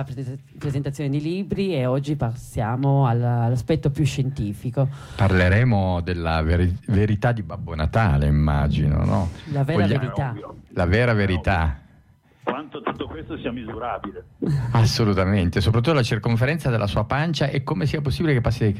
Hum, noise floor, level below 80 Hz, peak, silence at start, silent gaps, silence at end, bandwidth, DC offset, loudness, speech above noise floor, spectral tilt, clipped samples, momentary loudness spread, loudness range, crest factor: none; -55 dBFS; -34 dBFS; -8 dBFS; 0 s; none; 0 s; 13.5 kHz; under 0.1%; -22 LUFS; 33 dB; -7 dB/octave; under 0.1%; 11 LU; 4 LU; 12 dB